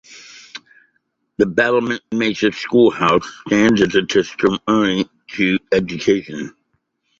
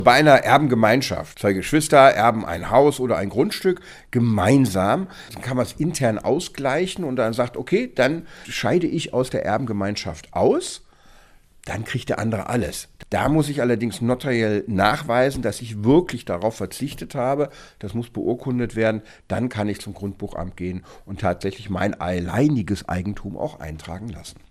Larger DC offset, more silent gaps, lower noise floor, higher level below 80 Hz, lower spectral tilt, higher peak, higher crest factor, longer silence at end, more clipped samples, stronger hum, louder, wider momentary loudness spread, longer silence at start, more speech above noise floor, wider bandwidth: neither; neither; first, -68 dBFS vs -50 dBFS; second, -52 dBFS vs -46 dBFS; about the same, -5 dB/octave vs -5.5 dB/octave; about the same, -2 dBFS vs 0 dBFS; second, 16 dB vs 22 dB; first, 0.7 s vs 0.2 s; neither; neither; first, -17 LUFS vs -21 LUFS; first, 21 LU vs 14 LU; about the same, 0.1 s vs 0 s; first, 52 dB vs 29 dB; second, 7.8 kHz vs 15.5 kHz